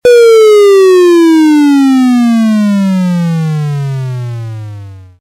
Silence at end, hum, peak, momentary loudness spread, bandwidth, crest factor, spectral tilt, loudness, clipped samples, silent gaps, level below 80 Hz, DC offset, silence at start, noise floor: 0.2 s; none; 0 dBFS; 16 LU; 16 kHz; 6 dB; -7 dB/octave; -7 LUFS; under 0.1%; none; -52 dBFS; under 0.1%; 0.05 s; -27 dBFS